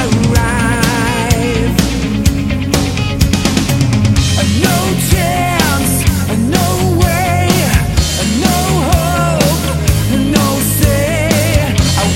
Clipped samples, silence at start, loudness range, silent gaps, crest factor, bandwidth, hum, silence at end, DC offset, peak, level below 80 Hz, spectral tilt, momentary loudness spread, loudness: under 0.1%; 0 s; 1 LU; none; 12 dB; 17 kHz; none; 0 s; under 0.1%; 0 dBFS; -20 dBFS; -5 dB/octave; 2 LU; -12 LUFS